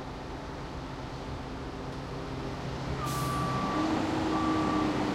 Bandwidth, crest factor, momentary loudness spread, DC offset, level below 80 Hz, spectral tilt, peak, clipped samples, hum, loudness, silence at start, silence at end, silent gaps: 16 kHz; 16 dB; 11 LU; under 0.1%; -46 dBFS; -6 dB/octave; -18 dBFS; under 0.1%; none; -33 LUFS; 0 s; 0 s; none